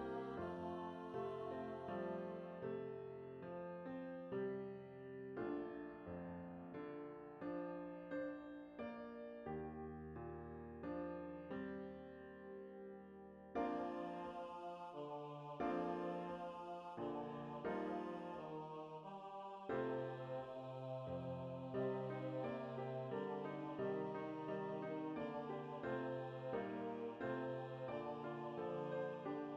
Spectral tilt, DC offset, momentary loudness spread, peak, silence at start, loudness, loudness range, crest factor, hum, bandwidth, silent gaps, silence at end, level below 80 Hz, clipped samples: -8.5 dB/octave; under 0.1%; 8 LU; -30 dBFS; 0 s; -48 LUFS; 4 LU; 18 dB; none; 9.6 kHz; none; 0 s; -76 dBFS; under 0.1%